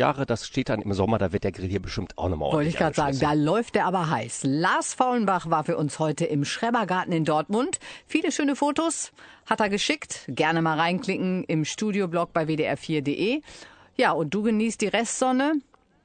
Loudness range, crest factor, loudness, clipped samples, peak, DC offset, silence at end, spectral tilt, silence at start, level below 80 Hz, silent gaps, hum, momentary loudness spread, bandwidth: 2 LU; 18 dB; -25 LUFS; under 0.1%; -6 dBFS; under 0.1%; 0.45 s; -5 dB/octave; 0 s; -52 dBFS; none; none; 6 LU; 9.4 kHz